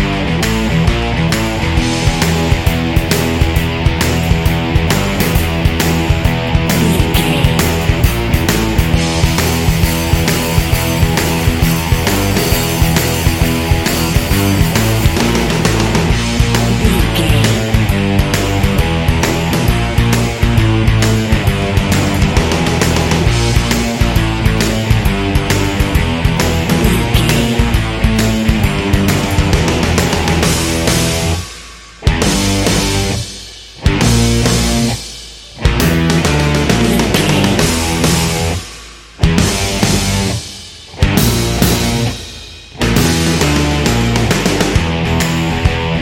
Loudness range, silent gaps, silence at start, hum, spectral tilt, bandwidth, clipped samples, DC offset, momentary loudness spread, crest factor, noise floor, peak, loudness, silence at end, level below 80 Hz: 2 LU; none; 0 s; none; -5 dB/octave; 17 kHz; under 0.1%; under 0.1%; 3 LU; 12 dB; -33 dBFS; 0 dBFS; -13 LUFS; 0 s; -20 dBFS